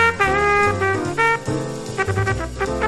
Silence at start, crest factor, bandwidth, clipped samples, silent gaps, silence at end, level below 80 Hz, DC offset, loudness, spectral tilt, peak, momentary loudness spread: 0 s; 18 dB; 13 kHz; under 0.1%; none; 0 s; -36 dBFS; under 0.1%; -19 LUFS; -5 dB/octave; -2 dBFS; 9 LU